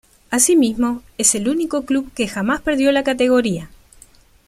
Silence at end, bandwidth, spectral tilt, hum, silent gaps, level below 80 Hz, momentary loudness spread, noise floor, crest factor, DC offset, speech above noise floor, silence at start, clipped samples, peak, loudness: 0.8 s; 15.5 kHz; -3 dB/octave; none; none; -46 dBFS; 9 LU; -49 dBFS; 18 dB; under 0.1%; 31 dB; 0.3 s; under 0.1%; -2 dBFS; -17 LUFS